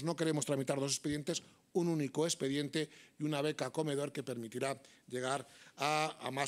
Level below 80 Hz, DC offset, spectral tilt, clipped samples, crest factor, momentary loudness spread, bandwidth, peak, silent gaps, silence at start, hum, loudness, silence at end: -76 dBFS; under 0.1%; -4.5 dB/octave; under 0.1%; 20 dB; 8 LU; 16 kHz; -16 dBFS; none; 0 s; none; -37 LUFS; 0 s